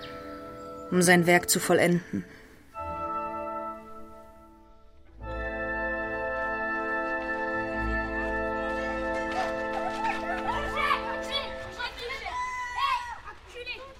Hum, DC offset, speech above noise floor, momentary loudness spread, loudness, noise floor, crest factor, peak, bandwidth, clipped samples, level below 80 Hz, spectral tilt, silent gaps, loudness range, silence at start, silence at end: none; under 0.1%; 29 dB; 18 LU; -28 LUFS; -52 dBFS; 22 dB; -8 dBFS; 16 kHz; under 0.1%; -46 dBFS; -4 dB/octave; none; 9 LU; 0 s; 0 s